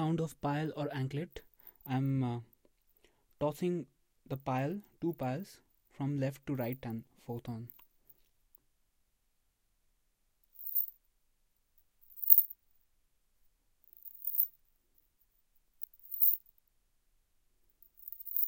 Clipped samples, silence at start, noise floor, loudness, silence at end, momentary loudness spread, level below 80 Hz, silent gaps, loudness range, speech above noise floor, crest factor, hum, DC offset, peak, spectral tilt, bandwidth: under 0.1%; 0 s; -77 dBFS; -33 LUFS; 0 s; 21 LU; -70 dBFS; none; 12 LU; 40 dB; 32 dB; none; under 0.1%; -6 dBFS; -7.5 dB/octave; 17 kHz